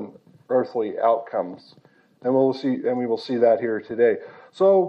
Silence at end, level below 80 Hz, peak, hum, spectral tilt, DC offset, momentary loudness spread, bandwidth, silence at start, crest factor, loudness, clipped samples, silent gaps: 0 s; -78 dBFS; -6 dBFS; none; -8 dB/octave; under 0.1%; 11 LU; 8 kHz; 0 s; 16 dB; -22 LUFS; under 0.1%; none